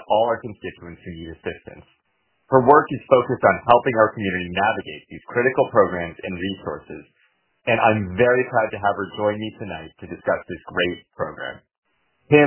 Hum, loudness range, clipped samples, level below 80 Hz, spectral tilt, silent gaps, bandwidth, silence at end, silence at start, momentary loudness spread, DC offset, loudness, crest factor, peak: none; 6 LU; under 0.1%; -50 dBFS; -10 dB/octave; 11.78-11.83 s; 4 kHz; 0 s; 0.1 s; 19 LU; under 0.1%; -20 LUFS; 22 dB; 0 dBFS